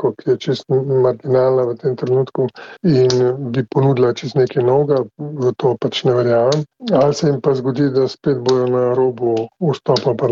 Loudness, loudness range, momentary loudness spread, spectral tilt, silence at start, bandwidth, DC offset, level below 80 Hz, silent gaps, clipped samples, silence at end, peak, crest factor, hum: -17 LUFS; 1 LU; 6 LU; -7 dB/octave; 0 s; 7.4 kHz; under 0.1%; -58 dBFS; none; under 0.1%; 0 s; -2 dBFS; 14 dB; none